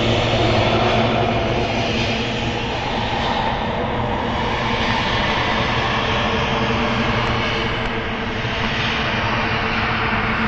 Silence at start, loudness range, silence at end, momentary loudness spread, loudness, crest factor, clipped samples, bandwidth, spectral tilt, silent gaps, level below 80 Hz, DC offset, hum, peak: 0 s; 2 LU; 0 s; 5 LU; -19 LUFS; 16 dB; under 0.1%; 8 kHz; -5.5 dB/octave; none; -32 dBFS; under 0.1%; none; -4 dBFS